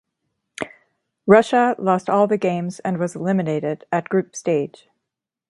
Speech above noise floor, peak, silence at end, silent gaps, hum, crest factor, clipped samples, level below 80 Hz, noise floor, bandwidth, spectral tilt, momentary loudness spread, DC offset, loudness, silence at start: 64 dB; 0 dBFS; 0.8 s; none; none; 20 dB; under 0.1%; -66 dBFS; -83 dBFS; 11.5 kHz; -6.5 dB/octave; 17 LU; under 0.1%; -20 LUFS; 0.6 s